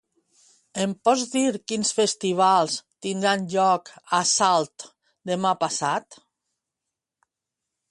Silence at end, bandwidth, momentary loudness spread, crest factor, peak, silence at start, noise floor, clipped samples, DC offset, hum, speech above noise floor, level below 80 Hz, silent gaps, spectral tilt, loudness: 1.75 s; 11.5 kHz; 11 LU; 18 dB; -6 dBFS; 0.75 s; -86 dBFS; under 0.1%; under 0.1%; none; 63 dB; -72 dBFS; none; -3 dB/octave; -23 LUFS